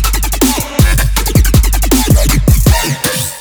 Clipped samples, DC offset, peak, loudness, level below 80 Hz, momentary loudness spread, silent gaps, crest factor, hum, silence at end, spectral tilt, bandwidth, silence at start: under 0.1%; under 0.1%; 0 dBFS; -11 LUFS; -12 dBFS; 4 LU; none; 10 dB; none; 0 s; -4.5 dB/octave; over 20 kHz; 0 s